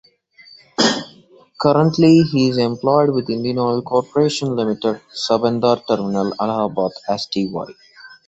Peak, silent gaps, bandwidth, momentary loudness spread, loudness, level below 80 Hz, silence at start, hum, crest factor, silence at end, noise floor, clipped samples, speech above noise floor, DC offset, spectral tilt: -2 dBFS; none; 8.2 kHz; 10 LU; -18 LUFS; -56 dBFS; 0.8 s; none; 16 dB; 0.15 s; -48 dBFS; under 0.1%; 31 dB; under 0.1%; -6 dB/octave